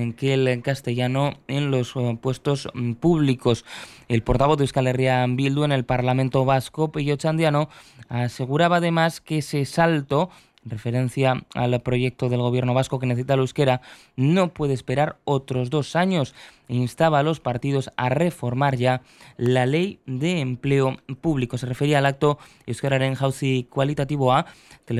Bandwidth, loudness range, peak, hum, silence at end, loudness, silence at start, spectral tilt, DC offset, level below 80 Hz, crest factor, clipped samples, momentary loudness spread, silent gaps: 13 kHz; 2 LU; -6 dBFS; none; 0 s; -23 LUFS; 0 s; -6.5 dB/octave; under 0.1%; -48 dBFS; 16 dB; under 0.1%; 7 LU; none